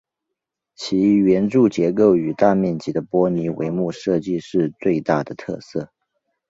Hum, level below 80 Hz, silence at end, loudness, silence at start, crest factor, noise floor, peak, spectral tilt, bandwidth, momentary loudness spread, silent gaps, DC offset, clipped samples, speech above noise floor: none; -56 dBFS; 0.65 s; -19 LUFS; 0.8 s; 18 dB; -82 dBFS; -2 dBFS; -7.5 dB/octave; 7.8 kHz; 13 LU; none; under 0.1%; under 0.1%; 63 dB